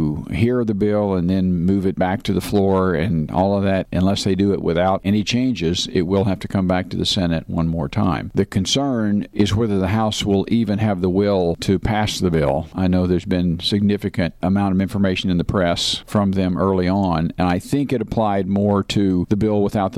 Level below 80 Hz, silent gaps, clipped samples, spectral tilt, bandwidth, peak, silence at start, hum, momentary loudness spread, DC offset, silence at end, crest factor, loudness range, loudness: -40 dBFS; none; under 0.1%; -6 dB/octave; 14 kHz; -6 dBFS; 0 s; none; 3 LU; under 0.1%; 0 s; 12 dB; 1 LU; -19 LUFS